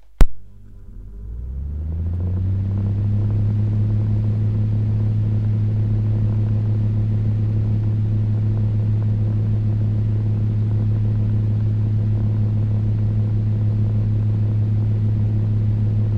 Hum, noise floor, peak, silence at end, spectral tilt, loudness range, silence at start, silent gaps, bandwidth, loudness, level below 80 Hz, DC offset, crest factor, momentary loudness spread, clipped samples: none; -40 dBFS; 0 dBFS; 0 s; -10.5 dB/octave; 2 LU; 0.2 s; none; 2.9 kHz; -20 LUFS; -28 dBFS; 0.7%; 18 dB; 3 LU; under 0.1%